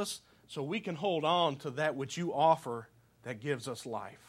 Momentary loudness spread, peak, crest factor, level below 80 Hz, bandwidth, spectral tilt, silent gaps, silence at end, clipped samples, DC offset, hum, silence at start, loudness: 15 LU; -14 dBFS; 20 dB; -76 dBFS; 14 kHz; -4.5 dB/octave; none; 0.1 s; under 0.1%; under 0.1%; none; 0 s; -33 LUFS